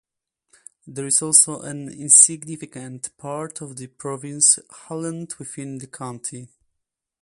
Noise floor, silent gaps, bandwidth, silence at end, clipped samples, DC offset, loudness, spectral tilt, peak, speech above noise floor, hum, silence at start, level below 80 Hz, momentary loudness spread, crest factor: -80 dBFS; none; 14 kHz; 0.75 s; under 0.1%; under 0.1%; -15 LUFS; -2.5 dB/octave; 0 dBFS; 57 dB; none; 0.85 s; -70 dBFS; 21 LU; 24 dB